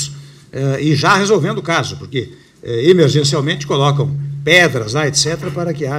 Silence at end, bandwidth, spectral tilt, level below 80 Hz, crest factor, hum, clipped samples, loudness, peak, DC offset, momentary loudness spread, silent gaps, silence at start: 0 s; 15 kHz; -4.5 dB/octave; -50 dBFS; 16 dB; none; under 0.1%; -14 LUFS; 0 dBFS; under 0.1%; 13 LU; none; 0 s